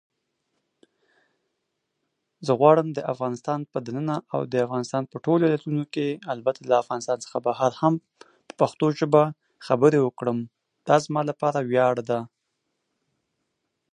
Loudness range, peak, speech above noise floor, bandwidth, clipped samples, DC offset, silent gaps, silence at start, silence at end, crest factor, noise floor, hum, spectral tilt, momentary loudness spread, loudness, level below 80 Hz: 3 LU; -4 dBFS; 55 dB; 10.5 kHz; under 0.1%; under 0.1%; none; 2.4 s; 1.65 s; 22 dB; -79 dBFS; none; -7 dB/octave; 10 LU; -24 LUFS; -72 dBFS